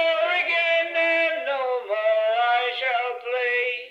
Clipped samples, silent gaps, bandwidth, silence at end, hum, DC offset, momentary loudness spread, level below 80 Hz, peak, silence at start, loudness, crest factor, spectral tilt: under 0.1%; none; 7.6 kHz; 0 s; none; under 0.1%; 6 LU; -74 dBFS; -10 dBFS; 0 s; -22 LUFS; 12 dB; -1 dB/octave